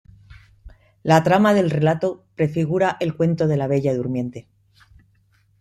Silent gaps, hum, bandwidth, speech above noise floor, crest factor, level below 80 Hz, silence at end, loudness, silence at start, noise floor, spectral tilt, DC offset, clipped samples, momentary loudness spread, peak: none; none; 13 kHz; 41 dB; 18 dB; -54 dBFS; 1.2 s; -20 LUFS; 0.3 s; -60 dBFS; -7.5 dB/octave; under 0.1%; under 0.1%; 11 LU; -4 dBFS